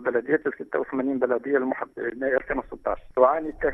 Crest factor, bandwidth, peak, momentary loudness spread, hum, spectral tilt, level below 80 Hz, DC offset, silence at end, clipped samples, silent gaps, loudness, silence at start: 20 dB; 3.8 kHz; -6 dBFS; 9 LU; none; -9 dB/octave; -50 dBFS; under 0.1%; 0 s; under 0.1%; none; -25 LUFS; 0 s